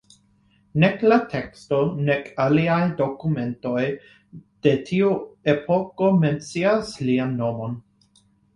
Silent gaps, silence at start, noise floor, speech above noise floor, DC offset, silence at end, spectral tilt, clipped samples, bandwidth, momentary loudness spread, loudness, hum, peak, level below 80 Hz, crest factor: none; 0.75 s; -60 dBFS; 39 dB; under 0.1%; 0.75 s; -7.5 dB/octave; under 0.1%; 11 kHz; 9 LU; -22 LUFS; none; -4 dBFS; -56 dBFS; 18 dB